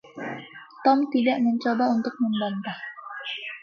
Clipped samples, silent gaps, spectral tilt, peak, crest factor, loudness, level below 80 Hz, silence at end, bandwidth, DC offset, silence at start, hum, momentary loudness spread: under 0.1%; none; -6.5 dB/octave; -8 dBFS; 18 dB; -25 LUFS; -76 dBFS; 0.05 s; 6.6 kHz; under 0.1%; 0.05 s; none; 14 LU